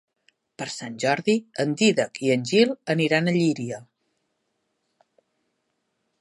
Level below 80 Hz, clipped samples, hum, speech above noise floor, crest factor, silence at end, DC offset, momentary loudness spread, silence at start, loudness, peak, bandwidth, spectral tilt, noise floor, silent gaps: -72 dBFS; under 0.1%; none; 53 dB; 20 dB; 2.4 s; under 0.1%; 13 LU; 0.6 s; -23 LUFS; -4 dBFS; 11.5 kHz; -5 dB/octave; -75 dBFS; none